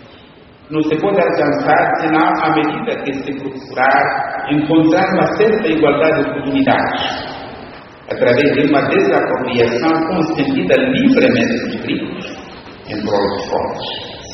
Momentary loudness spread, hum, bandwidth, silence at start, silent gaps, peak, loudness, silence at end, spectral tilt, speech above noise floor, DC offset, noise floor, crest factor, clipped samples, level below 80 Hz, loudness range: 13 LU; none; 6.4 kHz; 0.05 s; none; 0 dBFS; -15 LUFS; 0 s; -4 dB/octave; 27 dB; under 0.1%; -41 dBFS; 16 dB; under 0.1%; -48 dBFS; 2 LU